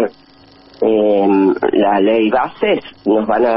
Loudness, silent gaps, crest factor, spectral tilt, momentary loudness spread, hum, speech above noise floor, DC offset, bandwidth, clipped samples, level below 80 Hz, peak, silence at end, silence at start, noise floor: -14 LUFS; none; 10 dB; -10.5 dB/octave; 5 LU; none; 31 dB; under 0.1%; 5.8 kHz; under 0.1%; -52 dBFS; -4 dBFS; 0 s; 0 s; -45 dBFS